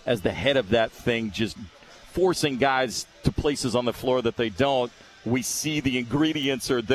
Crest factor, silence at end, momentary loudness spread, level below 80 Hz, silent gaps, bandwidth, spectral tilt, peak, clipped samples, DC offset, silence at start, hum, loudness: 18 dB; 0 s; 7 LU; -46 dBFS; none; 14 kHz; -4.5 dB/octave; -8 dBFS; under 0.1%; under 0.1%; 0.05 s; none; -25 LUFS